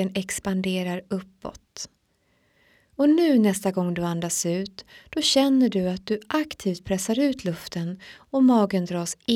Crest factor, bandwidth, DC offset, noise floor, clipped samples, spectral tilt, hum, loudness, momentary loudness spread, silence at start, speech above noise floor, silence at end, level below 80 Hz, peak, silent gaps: 16 dB; 16.5 kHz; under 0.1%; -67 dBFS; under 0.1%; -4.5 dB/octave; none; -24 LUFS; 19 LU; 0 s; 44 dB; 0 s; -58 dBFS; -8 dBFS; none